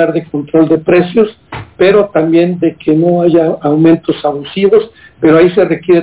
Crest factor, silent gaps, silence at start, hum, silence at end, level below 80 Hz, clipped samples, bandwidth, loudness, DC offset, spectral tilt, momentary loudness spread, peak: 10 dB; none; 0 s; none; 0 s; -46 dBFS; under 0.1%; 4 kHz; -10 LUFS; under 0.1%; -11.5 dB/octave; 8 LU; 0 dBFS